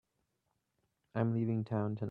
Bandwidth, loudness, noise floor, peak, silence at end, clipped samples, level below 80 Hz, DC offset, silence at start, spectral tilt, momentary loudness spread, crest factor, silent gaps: 4.5 kHz; -36 LUFS; -83 dBFS; -18 dBFS; 0 s; under 0.1%; -74 dBFS; under 0.1%; 1.15 s; -11 dB/octave; 4 LU; 20 dB; none